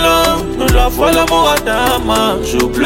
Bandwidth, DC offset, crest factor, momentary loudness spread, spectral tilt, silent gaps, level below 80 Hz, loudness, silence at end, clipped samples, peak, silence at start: 17 kHz; 0.1%; 12 dB; 4 LU; -4 dB/octave; none; -20 dBFS; -12 LUFS; 0 s; under 0.1%; 0 dBFS; 0 s